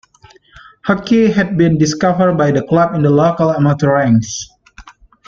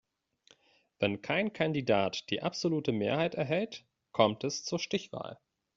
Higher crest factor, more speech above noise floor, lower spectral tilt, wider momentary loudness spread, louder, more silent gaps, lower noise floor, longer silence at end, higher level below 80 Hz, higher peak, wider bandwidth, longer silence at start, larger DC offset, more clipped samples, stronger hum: second, 12 dB vs 24 dB; about the same, 34 dB vs 35 dB; first, -6.5 dB/octave vs -4 dB/octave; second, 7 LU vs 11 LU; first, -13 LUFS vs -32 LUFS; neither; second, -46 dBFS vs -66 dBFS; about the same, 0.35 s vs 0.4 s; first, -46 dBFS vs -70 dBFS; first, -2 dBFS vs -10 dBFS; about the same, 7.6 kHz vs 7.6 kHz; second, 0.85 s vs 1 s; neither; neither; neither